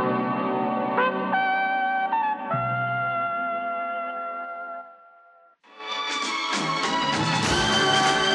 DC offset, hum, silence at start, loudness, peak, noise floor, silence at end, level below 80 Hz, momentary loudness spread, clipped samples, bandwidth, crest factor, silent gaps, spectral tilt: under 0.1%; none; 0 s; -24 LUFS; -8 dBFS; -55 dBFS; 0 s; -52 dBFS; 12 LU; under 0.1%; 12.5 kHz; 16 dB; none; -3.5 dB/octave